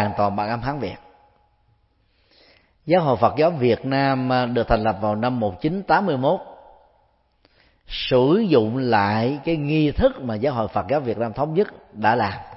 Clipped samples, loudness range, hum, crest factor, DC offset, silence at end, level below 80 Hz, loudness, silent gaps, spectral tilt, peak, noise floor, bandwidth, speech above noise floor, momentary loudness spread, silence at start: under 0.1%; 4 LU; none; 20 dB; under 0.1%; 0 s; -42 dBFS; -21 LUFS; none; -11 dB/octave; -2 dBFS; -63 dBFS; 5.8 kHz; 42 dB; 8 LU; 0 s